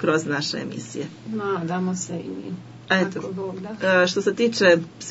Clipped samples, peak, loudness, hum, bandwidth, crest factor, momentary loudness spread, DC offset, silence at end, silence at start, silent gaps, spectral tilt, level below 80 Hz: under 0.1%; -4 dBFS; -23 LUFS; none; 8 kHz; 20 dB; 15 LU; under 0.1%; 0 s; 0 s; none; -4.5 dB/octave; -66 dBFS